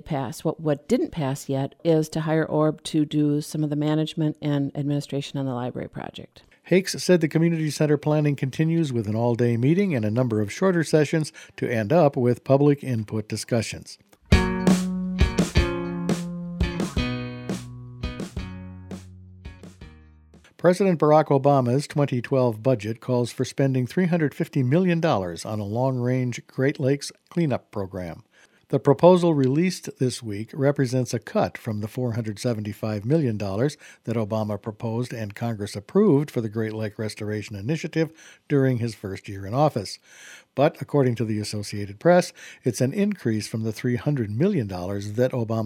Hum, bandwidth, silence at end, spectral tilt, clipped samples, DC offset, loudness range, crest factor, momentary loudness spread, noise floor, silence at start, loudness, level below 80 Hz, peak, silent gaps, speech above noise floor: none; 15.5 kHz; 0 s; -6.5 dB/octave; under 0.1%; under 0.1%; 5 LU; 22 dB; 13 LU; -53 dBFS; 0.05 s; -24 LUFS; -40 dBFS; -2 dBFS; none; 30 dB